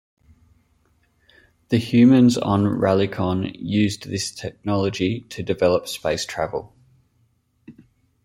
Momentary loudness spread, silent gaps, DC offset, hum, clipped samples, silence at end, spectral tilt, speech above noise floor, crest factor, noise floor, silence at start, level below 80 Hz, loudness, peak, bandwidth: 13 LU; none; under 0.1%; none; under 0.1%; 0.55 s; -6 dB/octave; 45 dB; 18 dB; -64 dBFS; 1.7 s; -54 dBFS; -21 LUFS; -4 dBFS; 13.5 kHz